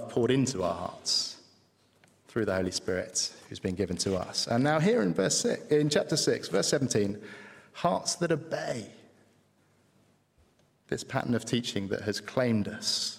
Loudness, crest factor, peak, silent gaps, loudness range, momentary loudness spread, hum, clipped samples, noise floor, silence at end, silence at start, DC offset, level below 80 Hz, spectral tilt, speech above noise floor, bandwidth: -29 LUFS; 20 dB; -12 dBFS; none; 9 LU; 11 LU; none; under 0.1%; -66 dBFS; 0 s; 0 s; under 0.1%; -64 dBFS; -4 dB/octave; 37 dB; 16.5 kHz